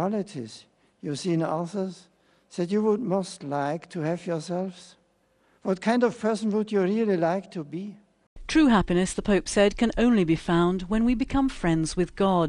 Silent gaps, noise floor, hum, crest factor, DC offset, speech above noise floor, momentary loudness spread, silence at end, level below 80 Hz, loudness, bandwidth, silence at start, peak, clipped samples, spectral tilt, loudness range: 8.27-8.36 s; -66 dBFS; none; 16 dB; under 0.1%; 41 dB; 14 LU; 0 s; -44 dBFS; -25 LUFS; 11.5 kHz; 0 s; -8 dBFS; under 0.1%; -6 dB/octave; 6 LU